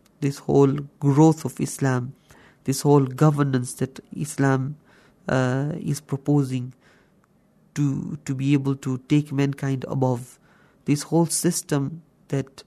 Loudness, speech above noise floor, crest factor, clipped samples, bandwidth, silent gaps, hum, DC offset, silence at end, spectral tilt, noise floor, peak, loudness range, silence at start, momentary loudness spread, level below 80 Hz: -23 LUFS; 38 dB; 20 dB; under 0.1%; 13.5 kHz; none; none; under 0.1%; 0.05 s; -6.5 dB/octave; -60 dBFS; -4 dBFS; 5 LU; 0.2 s; 12 LU; -60 dBFS